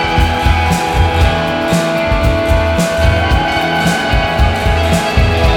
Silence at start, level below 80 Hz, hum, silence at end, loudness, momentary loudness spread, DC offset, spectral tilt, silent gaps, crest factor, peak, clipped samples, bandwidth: 0 s; -18 dBFS; none; 0 s; -13 LUFS; 2 LU; under 0.1%; -5.5 dB/octave; none; 12 dB; 0 dBFS; under 0.1%; 18 kHz